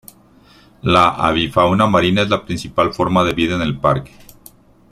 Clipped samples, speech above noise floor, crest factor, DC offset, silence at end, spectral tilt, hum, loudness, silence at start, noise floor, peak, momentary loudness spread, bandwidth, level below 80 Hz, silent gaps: under 0.1%; 32 dB; 16 dB; under 0.1%; 0.85 s; -6 dB/octave; none; -16 LUFS; 0.85 s; -48 dBFS; 0 dBFS; 6 LU; 14.5 kHz; -42 dBFS; none